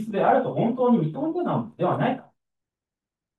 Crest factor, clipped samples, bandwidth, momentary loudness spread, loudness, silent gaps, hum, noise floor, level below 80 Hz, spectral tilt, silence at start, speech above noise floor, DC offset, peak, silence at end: 18 dB; under 0.1%; 4.2 kHz; 6 LU; -24 LUFS; none; none; -90 dBFS; -72 dBFS; -9.5 dB/octave; 0 s; 67 dB; under 0.1%; -6 dBFS; 1.15 s